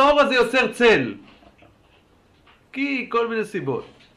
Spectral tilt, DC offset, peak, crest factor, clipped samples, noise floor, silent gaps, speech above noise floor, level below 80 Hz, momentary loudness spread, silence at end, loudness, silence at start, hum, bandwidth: -4.5 dB/octave; under 0.1%; -6 dBFS; 16 dB; under 0.1%; -57 dBFS; none; 36 dB; -54 dBFS; 14 LU; 0.3 s; -20 LUFS; 0 s; none; 13.5 kHz